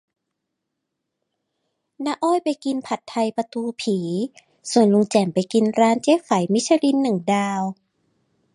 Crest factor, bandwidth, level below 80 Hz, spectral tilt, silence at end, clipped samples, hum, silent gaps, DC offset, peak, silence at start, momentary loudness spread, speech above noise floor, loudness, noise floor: 20 dB; 11.5 kHz; -70 dBFS; -5.5 dB/octave; 0.8 s; under 0.1%; none; none; under 0.1%; -2 dBFS; 2 s; 10 LU; 60 dB; -21 LUFS; -80 dBFS